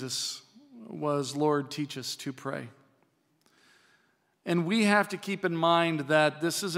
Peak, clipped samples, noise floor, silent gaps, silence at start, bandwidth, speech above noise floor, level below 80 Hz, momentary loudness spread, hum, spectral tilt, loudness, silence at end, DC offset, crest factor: -8 dBFS; under 0.1%; -70 dBFS; none; 0 s; 16 kHz; 42 dB; -86 dBFS; 14 LU; none; -4.5 dB/octave; -28 LUFS; 0 s; under 0.1%; 22 dB